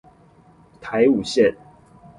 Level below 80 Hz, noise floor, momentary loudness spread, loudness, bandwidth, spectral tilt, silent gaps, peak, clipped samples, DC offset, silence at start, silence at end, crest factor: -56 dBFS; -52 dBFS; 11 LU; -19 LUFS; 11.5 kHz; -5.5 dB/octave; none; -4 dBFS; under 0.1%; under 0.1%; 0.8 s; 0.65 s; 18 dB